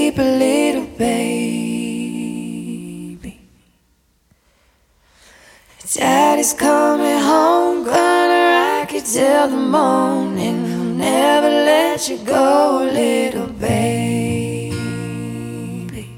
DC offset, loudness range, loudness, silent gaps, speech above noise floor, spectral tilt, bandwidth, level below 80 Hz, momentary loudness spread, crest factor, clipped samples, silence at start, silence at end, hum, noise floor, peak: under 0.1%; 13 LU; -16 LUFS; none; 44 dB; -4.5 dB/octave; 17 kHz; -50 dBFS; 14 LU; 16 dB; under 0.1%; 0 s; 0 s; none; -60 dBFS; -2 dBFS